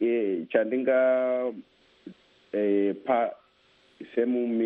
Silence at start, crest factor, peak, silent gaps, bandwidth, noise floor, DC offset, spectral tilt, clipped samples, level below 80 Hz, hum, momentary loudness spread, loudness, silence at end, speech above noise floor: 0 s; 18 dB; -8 dBFS; none; 4.6 kHz; -63 dBFS; under 0.1%; -9 dB/octave; under 0.1%; -74 dBFS; none; 10 LU; -26 LUFS; 0 s; 37 dB